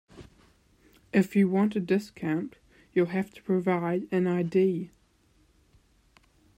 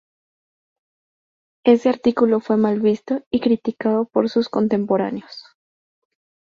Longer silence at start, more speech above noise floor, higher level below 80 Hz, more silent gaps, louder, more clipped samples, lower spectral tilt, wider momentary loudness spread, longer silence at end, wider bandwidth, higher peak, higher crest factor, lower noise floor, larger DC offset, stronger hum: second, 0.15 s vs 1.65 s; second, 38 dB vs over 72 dB; about the same, -66 dBFS vs -62 dBFS; second, none vs 3.26-3.31 s; second, -27 LUFS vs -19 LUFS; neither; about the same, -8 dB/octave vs -7.5 dB/octave; about the same, 8 LU vs 8 LU; first, 1.7 s vs 1.15 s; first, 15.5 kHz vs 7 kHz; second, -12 dBFS vs -2 dBFS; about the same, 18 dB vs 20 dB; second, -65 dBFS vs under -90 dBFS; neither; neither